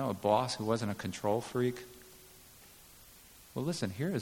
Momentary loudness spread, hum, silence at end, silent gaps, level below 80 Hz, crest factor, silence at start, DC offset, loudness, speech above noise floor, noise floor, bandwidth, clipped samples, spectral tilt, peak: 24 LU; none; 0 s; none; -66 dBFS; 20 dB; 0 s; under 0.1%; -34 LUFS; 24 dB; -57 dBFS; 18.5 kHz; under 0.1%; -5.5 dB/octave; -16 dBFS